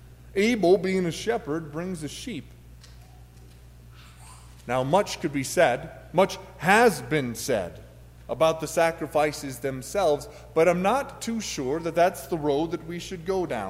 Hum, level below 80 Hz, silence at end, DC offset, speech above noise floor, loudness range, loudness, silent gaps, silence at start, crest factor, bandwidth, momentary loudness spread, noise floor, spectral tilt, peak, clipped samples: none; -50 dBFS; 0 s; under 0.1%; 23 dB; 8 LU; -25 LUFS; none; 0 s; 20 dB; 16 kHz; 12 LU; -48 dBFS; -5 dB/octave; -6 dBFS; under 0.1%